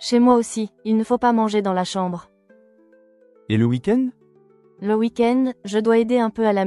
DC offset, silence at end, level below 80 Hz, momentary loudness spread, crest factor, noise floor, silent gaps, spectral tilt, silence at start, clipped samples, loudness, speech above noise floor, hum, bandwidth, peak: under 0.1%; 0 s; -60 dBFS; 10 LU; 16 dB; -54 dBFS; none; -6 dB/octave; 0 s; under 0.1%; -20 LUFS; 35 dB; none; 11.5 kHz; -4 dBFS